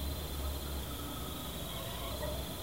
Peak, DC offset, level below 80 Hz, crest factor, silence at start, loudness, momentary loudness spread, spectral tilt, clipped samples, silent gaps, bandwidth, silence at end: -26 dBFS; 0.2%; -44 dBFS; 14 dB; 0 s; -40 LUFS; 2 LU; -4 dB/octave; under 0.1%; none; 16 kHz; 0 s